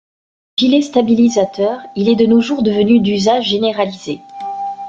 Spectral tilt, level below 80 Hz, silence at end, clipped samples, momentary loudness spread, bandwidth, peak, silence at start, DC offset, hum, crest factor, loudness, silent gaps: -5.5 dB/octave; -54 dBFS; 0 s; under 0.1%; 12 LU; 7.6 kHz; -2 dBFS; 0.6 s; under 0.1%; none; 12 dB; -14 LUFS; none